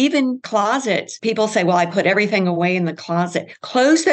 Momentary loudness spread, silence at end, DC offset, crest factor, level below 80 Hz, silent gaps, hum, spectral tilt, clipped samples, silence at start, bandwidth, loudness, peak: 6 LU; 0 s; under 0.1%; 14 dB; -72 dBFS; none; none; -5 dB/octave; under 0.1%; 0 s; 9 kHz; -18 LUFS; -4 dBFS